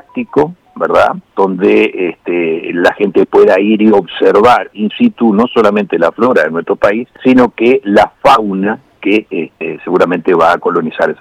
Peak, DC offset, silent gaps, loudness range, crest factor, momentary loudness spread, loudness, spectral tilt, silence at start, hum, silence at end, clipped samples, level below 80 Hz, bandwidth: 0 dBFS; under 0.1%; none; 2 LU; 10 dB; 8 LU; -11 LUFS; -6.5 dB/octave; 0.15 s; none; 0.05 s; under 0.1%; -48 dBFS; 12 kHz